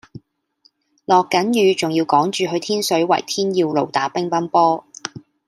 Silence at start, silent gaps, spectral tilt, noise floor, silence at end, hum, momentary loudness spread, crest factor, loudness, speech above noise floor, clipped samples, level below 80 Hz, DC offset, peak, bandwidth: 0.15 s; none; -4.5 dB/octave; -60 dBFS; 0.3 s; none; 8 LU; 18 dB; -18 LUFS; 43 dB; under 0.1%; -68 dBFS; under 0.1%; -2 dBFS; 15.5 kHz